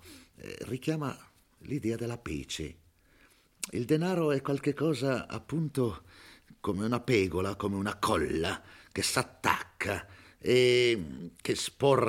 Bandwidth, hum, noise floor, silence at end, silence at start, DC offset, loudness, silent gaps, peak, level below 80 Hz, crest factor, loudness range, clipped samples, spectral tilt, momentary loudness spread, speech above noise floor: 16.5 kHz; none; -63 dBFS; 0 s; 0.05 s; under 0.1%; -31 LUFS; none; -8 dBFS; -58 dBFS; 22 dB; 8 LU; under 0.1%; -5 dB/octave; 13 LU; 33 dB